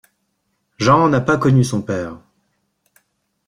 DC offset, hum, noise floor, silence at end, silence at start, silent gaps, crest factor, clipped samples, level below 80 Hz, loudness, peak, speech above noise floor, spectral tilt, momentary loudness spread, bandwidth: under 0.1%; none; -70 dBFS; 1.3 s; 0.8 s; none; 18 dB; under 0.1%; -50 dBFS; -16 LUFS; -2 dBFS; 54 dB; -6.5 dB/octave; 11 LU; 11 kHz